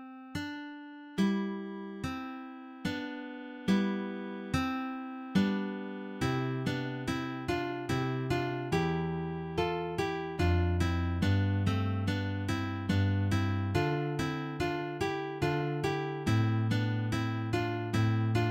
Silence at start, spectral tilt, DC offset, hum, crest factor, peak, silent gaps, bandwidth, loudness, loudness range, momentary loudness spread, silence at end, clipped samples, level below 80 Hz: 0 s; -7 dB/octave; under 0.1%; none; 16 dB; -16 dBFS; none; 15.5 kHz; -33 LUFS; 4 LU; 10 LU; 0 s; under 0.1%; -50 dBFS